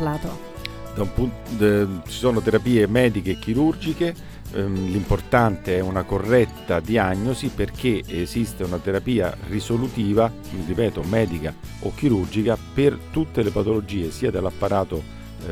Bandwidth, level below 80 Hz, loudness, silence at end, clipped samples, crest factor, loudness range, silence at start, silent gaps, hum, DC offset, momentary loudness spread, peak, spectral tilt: 18.5 kHz; -38 dBFS; -23 LUFS; 0 s; under 0.1%; 18 dB; 3 LU; 0 s; none; none; under 0.1%; 11 LU; -4 dBFS; -7 dB/octave